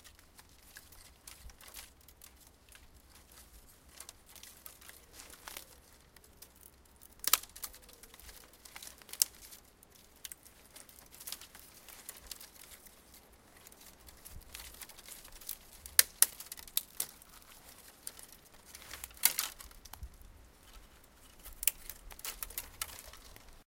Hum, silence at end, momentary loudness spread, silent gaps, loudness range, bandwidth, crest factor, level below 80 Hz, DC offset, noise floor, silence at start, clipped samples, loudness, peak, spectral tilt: none; 0.15 s; 27 LU; none; 20 LU; 17 kHz; 42 dB; -60 dBFS; under 0.1%; -61 dBFS; 0 s; under 0.1%; -35 LUFS; 0 dBFS; 1 dB/octave